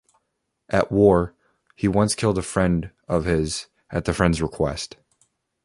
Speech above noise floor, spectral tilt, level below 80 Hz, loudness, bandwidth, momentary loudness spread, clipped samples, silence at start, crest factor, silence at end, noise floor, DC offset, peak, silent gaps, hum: 55 dB; -5.5 dB/octave; -40 dBFS; -22 LUFS; 11.5 kHz; 12 LU; under 0.1%; 0.7 s; 20 dB; 0.8 s; -76 dBFS; under 0.1%; -2 dBFS; none; none